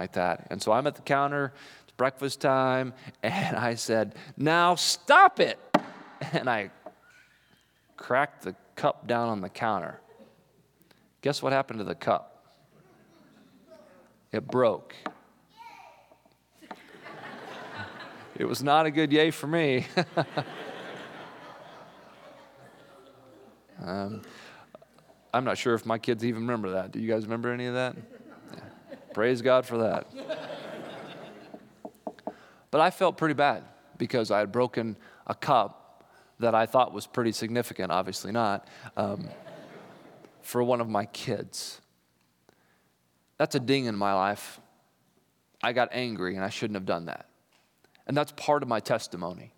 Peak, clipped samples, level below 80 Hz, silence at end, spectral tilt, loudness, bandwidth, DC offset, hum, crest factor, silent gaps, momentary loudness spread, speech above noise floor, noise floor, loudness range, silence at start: -4 dBFS; under 0.1%; -78 dBFS; 0.1 s; -5 dB/octave; -28 LUFS; 19 kHz; under 0.1%; none; 26 dB; none; 22 LU; 43 dB; -70 dBFS; 9 LU; 0 s